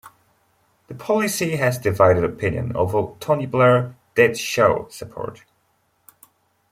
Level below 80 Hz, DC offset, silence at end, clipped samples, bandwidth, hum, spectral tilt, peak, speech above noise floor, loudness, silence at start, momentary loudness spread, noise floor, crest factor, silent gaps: -52 dBFS; under 0.1%; 1.35 s; under 0.1%; 16.5 kHz; none; -5.5 dB/octave; -2 dBFS; 46 dB; -19 LUFS; 0.05 s; 16 LU; -66 dBFS; 20 dB; none